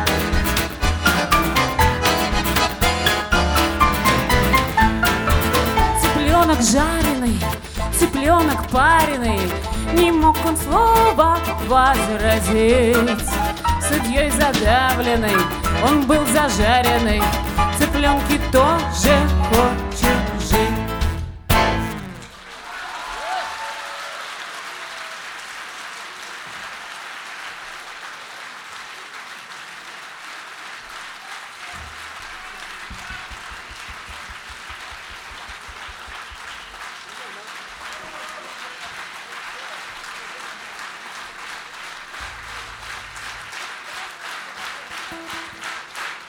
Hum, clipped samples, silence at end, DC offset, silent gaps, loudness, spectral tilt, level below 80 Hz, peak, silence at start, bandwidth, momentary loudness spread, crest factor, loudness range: none; under 0.1%; 0 s; under 0.1%; none; -18 LUFS; -4 dB/octave; -28 dBFS; -2 dBFS; 0 s; over 20 kHz; 18 LU; 18 dB; 17 LU